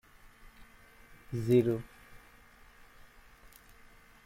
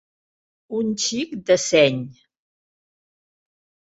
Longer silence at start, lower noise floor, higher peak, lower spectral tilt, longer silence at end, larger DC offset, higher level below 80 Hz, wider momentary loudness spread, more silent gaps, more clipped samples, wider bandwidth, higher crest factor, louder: first, 1.3 s vs 0.7 s; second, -58 dBFS vs under -90 dBFS; second, -14 dBFS vs -4 dBFS; first, -8 dB/octave vs -3.5 dB/octave; first, 2.1 s vs 1.7 s; neither; about the same, -60 dBFS vs -62 dBFS; first, 29 LU vs 14 LU; neither; neither; first, 16 kHz vs 8 kHz; about the same, 22 dB vs 22 dB; second, -30 LUFS vs -20 LUFS